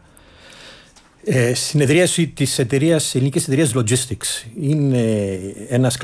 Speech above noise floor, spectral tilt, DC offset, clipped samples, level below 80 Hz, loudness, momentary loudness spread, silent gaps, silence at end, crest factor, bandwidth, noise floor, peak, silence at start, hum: 30 dB; -5 dB/octave; under 0.1%; under 0.1%; -52 dBFS; -18 LUFS; 8 LU; none; 0 s; 14 dB; 11 kHz; -47 dBFS; -4 dBFS; 0.55 s; none